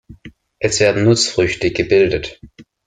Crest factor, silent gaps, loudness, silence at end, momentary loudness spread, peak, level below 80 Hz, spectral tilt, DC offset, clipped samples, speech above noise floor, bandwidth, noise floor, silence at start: 16 dB; none; -15 LUFS; 0.25 s; 9 LU; 0 dBFS; -42 dBFS; -4.5 dB/octave; under 0.1%; under 0.1%; 26 dB; 9.6 kHz; -41 dBFS; 0.1 s